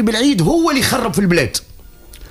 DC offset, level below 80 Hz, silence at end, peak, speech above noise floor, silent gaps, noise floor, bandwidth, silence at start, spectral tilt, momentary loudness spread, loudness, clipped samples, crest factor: under 0.1%; -38 dBFS; 0 s; -2 dBFS; 24 dB; none; -38 dBFS; 15.5 kHz; 0 s; -4.5 dB/octave; 4 LU; -15 LUFS; under 0.1%; 14 dB